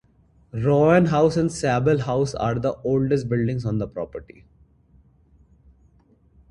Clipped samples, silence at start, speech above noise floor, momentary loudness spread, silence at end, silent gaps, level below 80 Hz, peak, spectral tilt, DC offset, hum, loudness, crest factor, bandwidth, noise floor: under 0.1%; 0.55 s; 37 dB; 14 LU; 2.3 s; none; -48 dBFS; -4 dBFS; -7.5 dB/octave; under 0.1%; none; -21 LUFS; 20 dB; 11 kHz; -58 dBFS